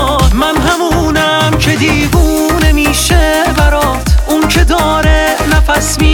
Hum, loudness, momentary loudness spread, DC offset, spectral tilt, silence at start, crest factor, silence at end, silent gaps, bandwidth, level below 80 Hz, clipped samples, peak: none; -10 LUFS; 2 LU; under 0.1%; -4.5 dB/octave; 0 s; 10 dB; 0 s; none; 19 kHz; -14 dBFS; under 0.1%; 0 dBFS